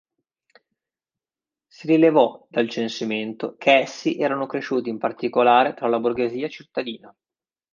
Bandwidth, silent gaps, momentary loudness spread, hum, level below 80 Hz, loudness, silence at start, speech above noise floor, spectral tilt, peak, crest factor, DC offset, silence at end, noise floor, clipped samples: 7.4 kHz; none; 13 LU; none; -70 dBFS; -21 LUFS; 1.8 s; over 69 dB; -5.5 dB/octave; -2 dBFS; 20 dB; under 0.1%; 0.65 s; under -90 dBFS; under 0.1%